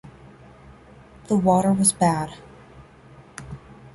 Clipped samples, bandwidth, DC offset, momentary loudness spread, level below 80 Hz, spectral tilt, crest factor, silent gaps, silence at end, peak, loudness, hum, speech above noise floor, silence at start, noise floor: under 0.1%; 11.5 kHz; under 0.1%; 24 LU; -52 dBFS; -5.5 dB/octave; 18 dB; none; 0.05 s; -6 dBFS; -20 LUFS; none; 28 dB; 0.05 s; -48 dBFS